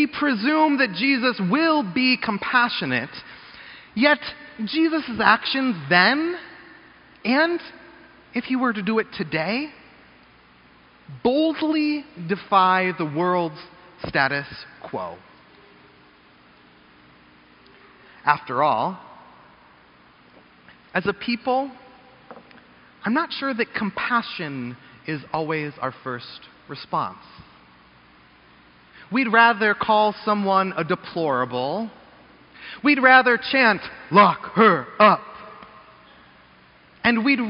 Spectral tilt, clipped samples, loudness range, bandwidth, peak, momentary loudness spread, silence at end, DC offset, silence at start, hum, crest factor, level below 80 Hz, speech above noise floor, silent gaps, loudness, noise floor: -2.5 dB/octave; under 0.1%; 11 LU; 5.6 kHz; 0 dBFS; 18 LU; 0 s; under 0.1%; 0 s; none; 22 dB; -62 dBFS; 32 dB; none; -21 LUFS; -53 dBFS